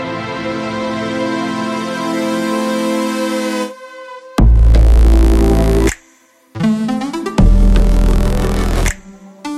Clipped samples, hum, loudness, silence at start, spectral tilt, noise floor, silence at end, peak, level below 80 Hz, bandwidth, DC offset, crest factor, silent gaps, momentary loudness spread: under 0.1%; none; -15 LUFS; 0 s; -6.5 dB/octave; -50 dBFS; 0 s; -2 dBFS; -14 dBFS; 13.5 kHz; under 0.1%; 12 dB; none; 11 LU